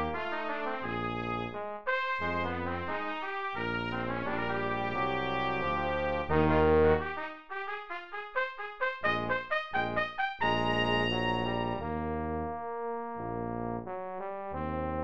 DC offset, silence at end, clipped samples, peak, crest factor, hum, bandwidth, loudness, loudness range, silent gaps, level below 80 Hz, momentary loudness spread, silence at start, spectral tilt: 0.4%; 0 s; under 0.1%; -12 dBFS; 20 dB; none; 8 kHz; -32 LUFS; 4 LU; none; -48 dBFS; 10 LU; 0 s; -7 dB/octave